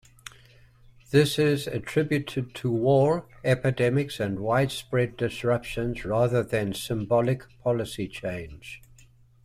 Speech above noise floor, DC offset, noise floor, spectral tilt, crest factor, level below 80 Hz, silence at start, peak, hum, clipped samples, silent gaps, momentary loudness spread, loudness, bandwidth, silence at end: 30 dB; under 0.1%; -55 dBFS; -6.5 dB/octave; 20 dB; -52 dBFS; 1.1 s; -8 dBFS; none; under 0.1%; none; 12 LU; -26 LUFS; 15.5 kHz; 0.65 s